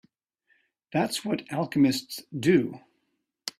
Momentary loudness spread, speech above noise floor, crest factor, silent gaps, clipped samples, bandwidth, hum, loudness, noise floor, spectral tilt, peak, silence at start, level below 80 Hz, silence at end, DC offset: 13 LU; 52 dB; 20 dB; none; under 0.1%; 15.5 kHz; none; -27 LUFS; -77 dBFS; -5.5 dB/octave; -8 dBFS; 0.95 s; -68 dBFS; 0.1 s; under 0.1%